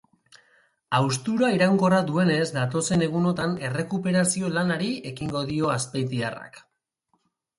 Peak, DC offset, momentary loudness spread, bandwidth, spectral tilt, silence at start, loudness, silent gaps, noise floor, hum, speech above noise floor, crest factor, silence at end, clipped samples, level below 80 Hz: -8 dBFS; under 0.1%; 9 LU; 11.5 kHz; -5 dB/octave; 0.9 s; -24 LUFS; none; -73 dBFS; none; 49 dB; 18 dB; 1 s; under 0.1%; -58 dBFS